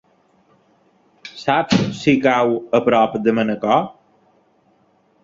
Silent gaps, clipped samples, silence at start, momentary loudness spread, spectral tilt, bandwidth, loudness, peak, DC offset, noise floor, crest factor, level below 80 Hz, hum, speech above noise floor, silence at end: none; under 0.1%; 1.25 s; 11 LU; -6 dB/octave; 7.8 kHz; -17 LUFS; -2 dBFS; under 0.1%; -59 dBFS; 18 dB; -56 dBFS; none; 42 dB; 1.35 s